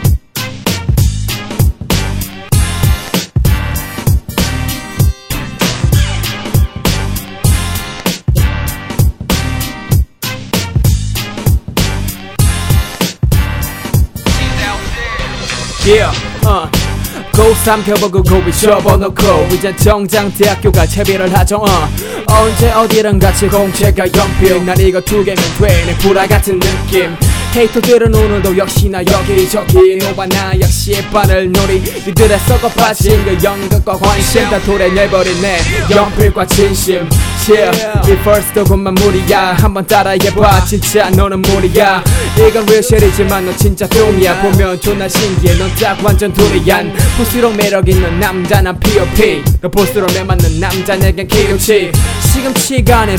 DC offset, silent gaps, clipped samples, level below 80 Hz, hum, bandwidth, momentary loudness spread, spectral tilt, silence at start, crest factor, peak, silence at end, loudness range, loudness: under 0.1%; none; 1%; -18 dBFS; none; 19 kHz; 7 LU; -5 dB/octave; 0 s; 10 dB; 0 dBFS; 0 s; 5 LU; -11 LUFS